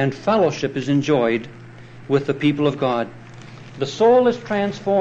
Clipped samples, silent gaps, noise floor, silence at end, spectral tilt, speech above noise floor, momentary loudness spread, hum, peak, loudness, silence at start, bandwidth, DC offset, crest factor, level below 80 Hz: under 0.1%; none; -39 dBFS; 0 s; -6.5 dB/octave; 20 dB; 23 LU; none; -6 dBFS; -19 LUFS; 0 s; 8.2 kHz; under 0.1%; 14 dB; -56 dBFS